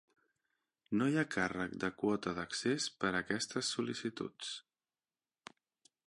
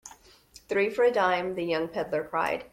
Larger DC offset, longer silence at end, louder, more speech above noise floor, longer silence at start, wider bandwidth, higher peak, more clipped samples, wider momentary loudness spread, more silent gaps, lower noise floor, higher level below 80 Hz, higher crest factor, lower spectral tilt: neither; first, 1.45 s vs 0.05 s; second, -37 LUFS vs -27 LUFS; first, over 53 dB vs 28 dB; first, 0.9 s vs 0.05 s; second, 11.5 kHz vs 16 kHz; second, -18 dBFS vs -10 dBFS; neither; first, 13 LU vs 7 LU; neither; first, under -90 dBFS vs -55 dBFS; second, -70 dBFS vs -62 dBFS; about the same, 20 dB vs 18 dB; about the same, -4 dB/octave vs -5 dB/octave